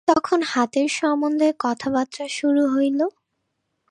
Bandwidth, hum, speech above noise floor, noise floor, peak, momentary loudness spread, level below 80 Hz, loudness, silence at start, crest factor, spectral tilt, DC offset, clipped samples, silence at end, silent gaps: 10.5 kHz; none; 55 dB; -75 dBFS; -2 dBFS; 6 LU; -64 dBFS; -21 LUFS; 0.05 s; 20 dB; -3.5 dB/octave; under 0.1%; under 0.1%; 0.8 s; none